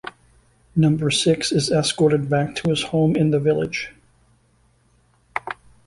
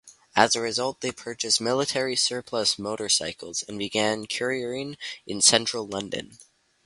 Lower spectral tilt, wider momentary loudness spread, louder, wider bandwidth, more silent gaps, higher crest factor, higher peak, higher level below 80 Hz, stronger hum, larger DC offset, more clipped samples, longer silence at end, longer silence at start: first, -5.5 dB/octave vs -1.5 dB/octave; about the same, 13 LU vs 13 LU; first, -20 LUFS vs -25 LUFS; about the same, 11.5 kHz vs 11.5 kHz; neither; second, 16 dB vs 26 dB; second, -4 dBFS vs 0 dBFS; first, -52 dBFS vs -64 dBFS; neither; neither; neither; second, 0.35 s vs 0.5 s; about the same, 0.05 s vs 0.05 s